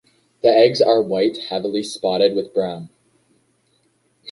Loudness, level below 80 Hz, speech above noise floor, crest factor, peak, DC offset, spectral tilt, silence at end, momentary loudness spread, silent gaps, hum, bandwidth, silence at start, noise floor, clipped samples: -18 LUFS; -64 dBFS; 46 dB; 18 dB; -2 dBFS; under 0.1%; -5 dB/octave; 0 s; 11 LU; none; none; 11.5 kHz; 0.45 s; -63 dBFS; under 0.1%